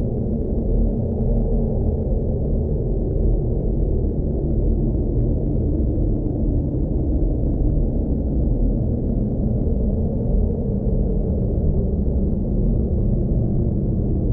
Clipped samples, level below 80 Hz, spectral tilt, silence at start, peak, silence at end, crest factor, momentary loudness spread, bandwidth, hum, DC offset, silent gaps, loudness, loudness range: under 0.1%; -22 dBFS; -15 dB/octave; 0 s; -8 dBFS; 0 s; 12 dB; 2 LU; 1.3 kHz; none; under 0.1%; none; -22 LUFS; 1 LU